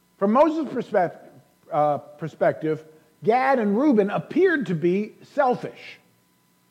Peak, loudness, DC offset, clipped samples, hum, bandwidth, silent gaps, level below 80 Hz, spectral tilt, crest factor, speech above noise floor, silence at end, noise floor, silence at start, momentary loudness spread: -8 dBFS; -23 LUFS; under 0.1%; under 0.1%; none; 11 kHz; none; -72 dBFS; -8 dB/octave; 16 dB; 41 dB; 0.75 s; -63 dBFS; 0.2 s; 10 LU